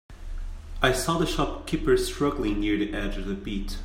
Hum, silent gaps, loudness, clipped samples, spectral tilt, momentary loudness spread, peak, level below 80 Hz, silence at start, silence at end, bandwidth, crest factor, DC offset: none; none; -26 LUFS; under 0.1%; -5 dB/octave; 17 LU; -8 dBFS; -34 dBFS; 0.1 s; 0 s; 16 kHz; 18 dB; under 0.1%